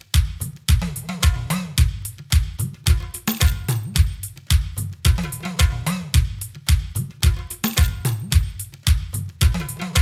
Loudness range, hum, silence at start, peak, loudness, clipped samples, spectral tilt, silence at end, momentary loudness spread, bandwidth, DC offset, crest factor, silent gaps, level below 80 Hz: 1 LU; none; 0.15 s; -2 dBFS; -22 LUFS; under 0.1%; -4 dB/octave; 0 s; 7 LU; 15.5 kHz; under 0.1%; 18 dB; none; -24 dBFS